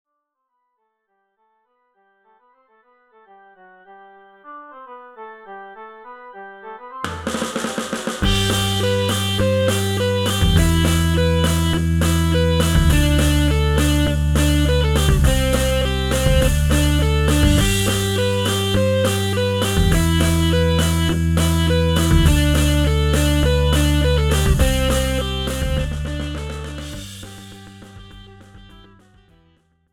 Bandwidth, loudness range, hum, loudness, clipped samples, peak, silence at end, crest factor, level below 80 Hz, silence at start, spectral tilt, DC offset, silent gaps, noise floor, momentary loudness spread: 18 kHz; 13 LU; none; -18 LUFS; under 0.1%; -2 dBFS; 1.3 s; 18 dB; -24 dBFS; 3.9 s; -5 dB/octave; under 0.1%; none; -75 dBFS; 20 LU